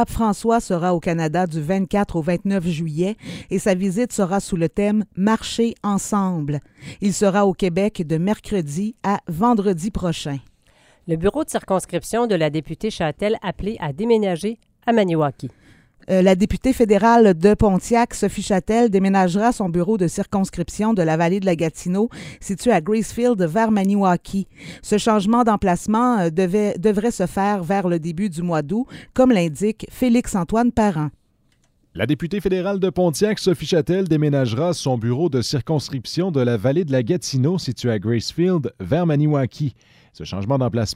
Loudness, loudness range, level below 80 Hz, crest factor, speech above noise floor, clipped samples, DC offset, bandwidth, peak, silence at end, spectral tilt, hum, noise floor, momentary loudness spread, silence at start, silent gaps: -20 LUFS; 5 LU; -42 dBFS; 18 dB; 42 dB; under 0.1%; under 0.1%; 16 kHz; -2 dBFS; 0 s; -6.5 dB/octave; none; -61 dBFS; 8 LU; 0 s; none